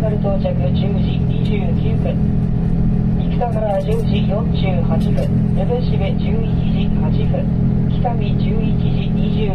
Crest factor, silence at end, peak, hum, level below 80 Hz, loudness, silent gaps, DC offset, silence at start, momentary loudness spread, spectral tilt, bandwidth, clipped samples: 10 dB; 0 s; -6 dBFS; none; -24 dBFS; -17 LUFS; none; under 0.1%; 0 s; 1 LU; -10 dB/octave; 5.6 kHz; under 0.1%